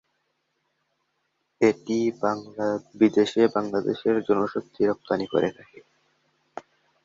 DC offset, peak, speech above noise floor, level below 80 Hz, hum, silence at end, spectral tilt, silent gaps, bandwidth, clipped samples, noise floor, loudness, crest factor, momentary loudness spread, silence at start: under 0.1%; -6 dBFS; 51 dB; -66 dBFS; none; 0.45 s; -6 dB/octave; none; 7.6 kHz; under 0.1%; -75 dBFS; -24 LUFS; 20 dB; 9 LU; 1.6 s